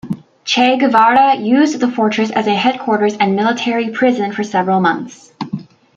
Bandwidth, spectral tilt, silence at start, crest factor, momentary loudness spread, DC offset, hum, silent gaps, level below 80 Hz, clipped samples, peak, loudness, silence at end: 7.8 kHz; -5 dB/octave; 0.05 s; 14 dB; 15 LU; under 0.1%; none; none; -62 dBFS; under 0.1%; 0 dBFS; -14 LUFS; 0.35 s